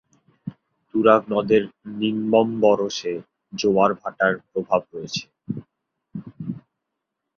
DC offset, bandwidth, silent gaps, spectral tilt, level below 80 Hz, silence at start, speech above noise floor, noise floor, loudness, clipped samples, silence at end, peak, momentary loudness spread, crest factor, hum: under 0.1%; 7.2 kHz; none; -5.5 dB/octave; -62 dBFS; 0.45 s; 60 dB; -81 dBFS; -21 LUFS; under 0.1%; 0.8 s; -2 dBFS; 21 LU; 20 dB; none